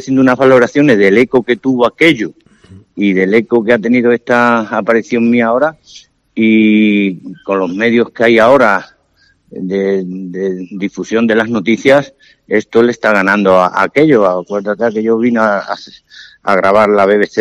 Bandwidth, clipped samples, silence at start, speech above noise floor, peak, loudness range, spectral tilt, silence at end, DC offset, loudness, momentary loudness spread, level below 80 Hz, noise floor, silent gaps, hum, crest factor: 10.5 kHz; 0.5%; 0 s; 43 dB; 0 dBFS; 3 LU; -6.5 dB/octave; 0 s; under 0.1%; -11 LUFS; 11 LU; -52 dBFS; -54 dBFS; none; none; 12 dB